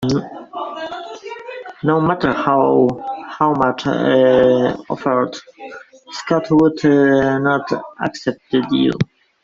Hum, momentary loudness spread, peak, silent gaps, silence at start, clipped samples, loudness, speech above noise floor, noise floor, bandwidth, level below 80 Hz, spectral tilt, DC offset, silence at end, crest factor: none; 18 LU; -2 dBFS; none; 0 s; under 0.1%; -16 LUFS; 21 dB; -36 dBFS; 7.6 kHz; -52 dBFS; -7 dB/octave; under 0.1%; 0.4 s; 14 dB